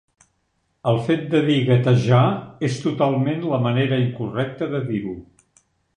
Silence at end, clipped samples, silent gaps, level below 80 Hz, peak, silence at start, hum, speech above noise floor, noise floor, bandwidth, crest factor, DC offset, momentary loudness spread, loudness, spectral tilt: 0.75 s; under 0.1%; none; -56 dBFS; -4 dBFS; 0.85 s; none; 50 dB; -69 dBFS; 9.6 kHz; 16 dB; under 0.1%; 9 LU; -20 LUFS; -7.5 dB/octave